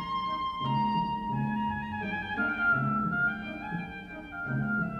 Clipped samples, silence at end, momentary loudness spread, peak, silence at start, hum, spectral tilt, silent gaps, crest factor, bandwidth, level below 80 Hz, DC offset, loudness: under 0.1%; 0 s; 10 LU; -18 dBFS; 0 s; none; -7.5 dB/octave; none; 14 dB; 6.8 kHz; -54 dBFS; under 0.1%; -30 LUFS